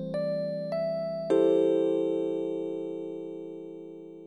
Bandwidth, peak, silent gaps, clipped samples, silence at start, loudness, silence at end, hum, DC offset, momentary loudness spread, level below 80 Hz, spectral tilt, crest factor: 9 kHz; -12 dBFS; none; under 0.1%; 0 s; -29 LUFS; 0 s; none; under 0.1%; 17 LU; -78 dBFS; -8 dB/octave; 16 dB